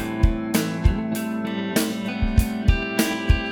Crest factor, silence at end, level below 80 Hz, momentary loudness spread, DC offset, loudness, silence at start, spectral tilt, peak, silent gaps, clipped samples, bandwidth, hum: 18 dB; 0 s; -26 dBFS; 5 LU; under 0.1%; -23 LUFS; 0 s; -5.5 dB/octave; -4 dBFS; none; under 0.1%; over 20 kHz; none